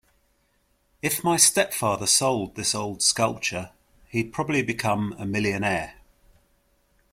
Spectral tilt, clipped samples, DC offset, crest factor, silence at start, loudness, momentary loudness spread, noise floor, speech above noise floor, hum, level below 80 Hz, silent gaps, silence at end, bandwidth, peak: -2.5 dB/octave; under 0.1%; under 0.1%; 24 dB; 1.05 s; -23 LUFS; 12 LU; -67 dBFS; 43 dB; none; -56 dBFS; none; 1.2 s; 16.5 kHz; -2 dBFS